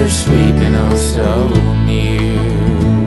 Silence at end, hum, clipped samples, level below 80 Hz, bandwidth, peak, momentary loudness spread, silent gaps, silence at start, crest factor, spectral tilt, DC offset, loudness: 0 s; none; under 0.1%; -18 dBFS; 12 kHz; 0 dBFS; 3 LU; none; 0 s; 12 dB; -6 dB/octave; under 0.1%; -13 LUFS